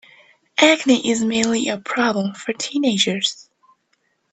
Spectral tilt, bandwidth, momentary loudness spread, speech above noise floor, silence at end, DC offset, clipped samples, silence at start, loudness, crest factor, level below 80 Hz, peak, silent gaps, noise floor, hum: -3 dB/octave; 9.2 kHz; 11 LU; 48 dB; 0.9 s; under 0.1%; under 0.1%; 0.6 s; -19 LUFS; 20 dB; -64 dBFS; 0 dBFS; none; -67 dBFS; none